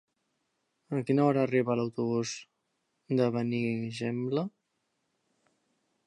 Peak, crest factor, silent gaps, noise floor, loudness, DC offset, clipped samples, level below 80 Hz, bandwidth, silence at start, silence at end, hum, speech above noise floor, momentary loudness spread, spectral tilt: -14 dBFS; 18 dB; none; -79 dBFS; -30 LUFS; under 0.1%; under 0.1%; -76 dBFS; 11 kHz; 0.9 s; 1.6 s; none; 50 dB; 10 LU; -6.5 dB/octave